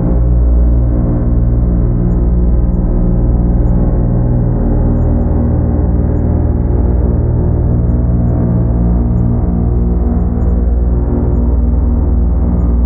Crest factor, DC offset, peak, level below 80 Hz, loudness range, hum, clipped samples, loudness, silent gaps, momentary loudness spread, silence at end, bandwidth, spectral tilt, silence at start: 10 dB; under 0.1%; 0 dBFS; -12 dBFS; 1 LU; 60 Hz at -20 dBFS; under 0.1%; -13 LUFS; none; 1 LU; 0 s; 2.1 kHz; -14.5 dB/octave; 0 s